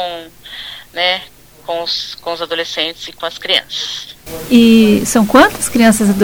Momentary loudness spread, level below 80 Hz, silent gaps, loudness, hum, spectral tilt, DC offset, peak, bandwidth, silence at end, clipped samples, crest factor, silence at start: 19 LU; -42 dBFS; none; -13 LUFS; none; -3.5 dB/octave; under 0.1%; 0 dBFS; over 20 kHz; 0 s; 0.3%; 14 dB; 0 s